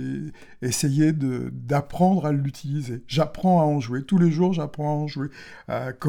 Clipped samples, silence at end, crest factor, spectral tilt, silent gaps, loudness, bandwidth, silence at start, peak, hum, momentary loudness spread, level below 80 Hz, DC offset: under 0.1%; 0 s; 16 dB; -6.5 dB/octave; none; -24 LUFS; 17 kHz; 0 s; -6 dBFS; none; 12 LU; -52 dBFS; under 0.1%